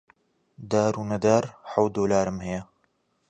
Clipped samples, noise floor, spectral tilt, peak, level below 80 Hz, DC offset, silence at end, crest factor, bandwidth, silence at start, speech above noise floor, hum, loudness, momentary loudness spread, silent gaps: under 0.1%; -70 dBFS; -6 dB/octave; -6 dBFS; -54 dBFS; under 0.1%; 0.65 s; 20 dB; 9.6 kHz; 0.6 s; 46 dB; none; -25 LUFS; 10 LU; none